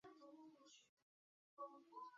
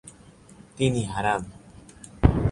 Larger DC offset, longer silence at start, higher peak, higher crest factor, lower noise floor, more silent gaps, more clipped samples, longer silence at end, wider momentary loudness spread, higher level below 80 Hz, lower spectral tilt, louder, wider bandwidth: neither; about the same, 0.05 s vs 0.05 s; second, -44 dBFS vs -2 dBFS; second, 18 dB vs 24 dB; first, under -90 dBFS vs -50 dBFS; first, 0.89-1.57 s vs none; neither; about the same, 0 s vs 0 s; second, 10 LU vs 23 LU; second, under -90 dBFS vs -34 dBFS; second, -2 dB/octave vs -6.5 dB/octave; second, -61 LUFS vs -25 LUFS; second, 7.4 kHz vs 11.5 kHz